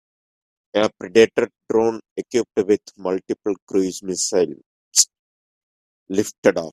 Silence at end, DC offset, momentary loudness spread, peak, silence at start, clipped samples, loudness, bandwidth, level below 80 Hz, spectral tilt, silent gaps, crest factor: 0.05 s; under 0.1%; 9 LU; 0 dBFS; 0.75 s; under 0.1%; -20 LUFS; 14.5 kHz; -62 dBFS; -3 dB/octave; 2.11-2.16 s, 3.62-3.67 s, 4.66-4.91 s, 5.19-6.06 s, 6.38-6.43 s; 22 dB